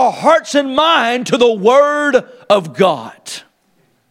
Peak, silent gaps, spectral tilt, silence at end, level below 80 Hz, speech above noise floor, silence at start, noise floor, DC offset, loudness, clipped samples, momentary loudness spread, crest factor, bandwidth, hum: 0 dBFS; none; -4 dB/octave; 0.7 s; -58 dBFS; 45 dB; 0 s; -58 dBFS; under 0.1%; -13 LUFS; under 0.1%; 16 LU; 14 dB; 14 kHz; none